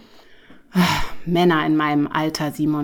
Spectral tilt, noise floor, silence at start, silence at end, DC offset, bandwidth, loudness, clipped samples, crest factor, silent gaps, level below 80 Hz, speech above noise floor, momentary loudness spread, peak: -5.5 dB/octave; -46 dBFS; 0.3 s; 0 s; under 0.1%; over 20 kHz; -20 LUFS; under 0.1%; 16 dB; none; -40 dBFS; 28 dB; 7 LU; -4 dBFS